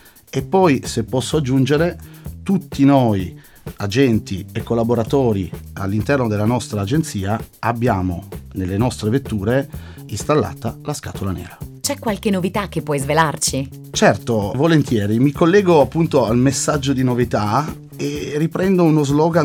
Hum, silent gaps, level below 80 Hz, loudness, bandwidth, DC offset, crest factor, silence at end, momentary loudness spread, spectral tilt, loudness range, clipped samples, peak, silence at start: none; none; -40 dBFS; -18 LUFS; 18 kHz; under 0.1%; 16 dB; 0 s; 12 LU; -6 dB/octave; 6 LU; under 0.1%; -2 dBFS; 0.35 s